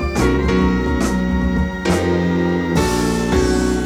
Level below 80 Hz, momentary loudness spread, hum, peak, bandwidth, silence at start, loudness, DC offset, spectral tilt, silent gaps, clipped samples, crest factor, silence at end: -24 dBFS; 2 LU; none; -4 dBFS; over 20 kHz; 0 s; -17 LUFS; under 0.1%; -6 dB/octave; none; under 0.1%; 14 dB; 0 s